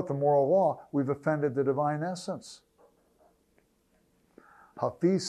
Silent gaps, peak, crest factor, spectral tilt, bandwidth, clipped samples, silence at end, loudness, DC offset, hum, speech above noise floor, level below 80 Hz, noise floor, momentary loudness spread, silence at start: none; -14 dBFS; 16 dB; -6.5 dB/octave; 11.5 kHz; under 0.1%; 0 s; -29 LUFS; under 0.1%; none; 41 dB; -74 dBFS; -69 dBFS; 13 LU; 0 s